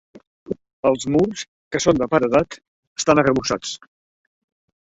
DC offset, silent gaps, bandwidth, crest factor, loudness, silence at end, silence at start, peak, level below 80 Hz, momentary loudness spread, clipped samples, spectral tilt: under 0.1%; 0.27-0.46 s, 0.73-0.83 s, 1.48-1.71 s, 2.68-2.96 s; 8.2 kHz; 20 dB; -20 LUFS; 1.2 s; 0.15 s; -2 dBFS; -50 dBFS; 16 LU; under 0.1%; -4.5 dB/octave